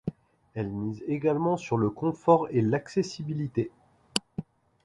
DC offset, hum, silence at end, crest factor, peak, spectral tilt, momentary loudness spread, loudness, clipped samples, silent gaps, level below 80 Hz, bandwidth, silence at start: under 0.1%; none; 0.45 s; 26 dB; -4 dBFS; -6.5 dB/octave; 14 LU; -28 LUFS; under 0.1%; none; -60 dBFS; 11.5 kHz; 0.05 s